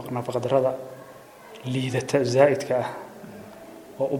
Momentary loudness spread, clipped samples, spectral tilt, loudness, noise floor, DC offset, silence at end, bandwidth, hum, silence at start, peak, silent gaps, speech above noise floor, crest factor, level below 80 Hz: 24 LU; under 0.1%; -6 dB/octave; -24 LUFS; -46 dBFS; under 0.1%; 0 s; 17.5 kHz; none; 0 s; -4 dBFS; none; 22 dB; 22 dB; -66 dBFS